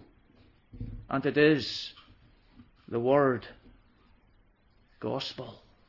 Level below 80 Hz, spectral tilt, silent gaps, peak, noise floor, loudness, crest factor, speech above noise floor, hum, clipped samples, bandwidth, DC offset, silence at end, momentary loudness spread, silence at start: -56 dBFS; -6.5 dB/octave; none; -12 dBFS; -64 dBFS; -28 LUFS; 20 dB; 37 dB; none; under 0.1%; 6 kHz; under 0.1%; 0.3 s; 20 LU; 0.75 s